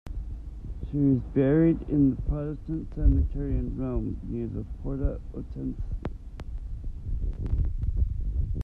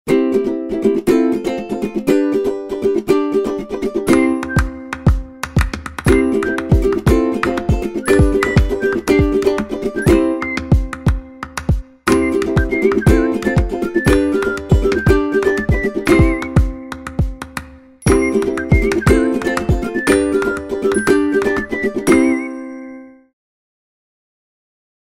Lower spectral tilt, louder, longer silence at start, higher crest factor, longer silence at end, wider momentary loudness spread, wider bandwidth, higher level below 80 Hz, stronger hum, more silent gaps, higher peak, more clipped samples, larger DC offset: first, -11.5 dB/octave vs -6.5 dB/octave; second, -29 LUFS vs -16 LUFS; about the same, 0.05 s vs 0.05 s; about the same, 18 dB vs 14 dB; second, 0 s vs 1.95 s; first, 16 LU vs 8 LU; second, 3.7 kHz vs 16 kHz; second, -32 dBFS vs -24 dBFS; neither; neither; second, -10 dBFS vs 0 dBFS; neither; neither